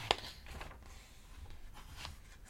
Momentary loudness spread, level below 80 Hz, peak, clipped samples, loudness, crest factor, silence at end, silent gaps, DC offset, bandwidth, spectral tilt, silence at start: 20 LU; -54 dBFS; -8 dBFS; under 0.1%; -45 LUFS; 38 dB; 0 s; none; under 0.1%; 16.5 kHz; -2.5 dB/octave; 0 s